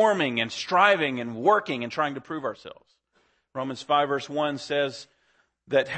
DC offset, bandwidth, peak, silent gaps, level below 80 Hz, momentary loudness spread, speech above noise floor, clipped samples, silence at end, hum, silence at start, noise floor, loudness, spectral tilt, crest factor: under 0.1%; 8.8 kHz; -6 dBFS; none; -72 dBFS; 14 LU; 43 dB; under 0.1%; 0 s; none; 0 s; -68 dBFS; -25 LUFS; -4.5 dB/octave; 20 dB